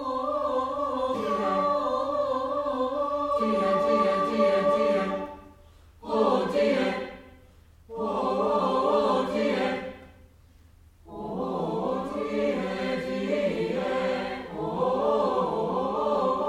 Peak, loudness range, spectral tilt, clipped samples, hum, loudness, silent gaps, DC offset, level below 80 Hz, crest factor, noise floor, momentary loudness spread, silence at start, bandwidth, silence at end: -10 dBFS; 5 LU; -6.5 dB/octave; under 0.1%; none; -27 LUFS; none; under 0.1%; -56 dBFS; 16 dB; -55 dBFS; 10 LU; 0 s; 11 kHz; 0 s